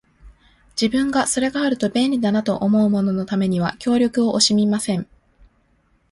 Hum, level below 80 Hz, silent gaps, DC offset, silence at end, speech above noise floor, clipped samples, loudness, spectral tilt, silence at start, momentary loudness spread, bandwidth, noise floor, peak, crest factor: none; -52 dBFS; none; under 0.1%; 1.1 s; 43 dB; under 0.1%; -19 LUFS; -4.5 dB/octave; 0.25 s; 7 LU; 11.5 kHz; -61 dBFS; -4 dBFS; 16 dB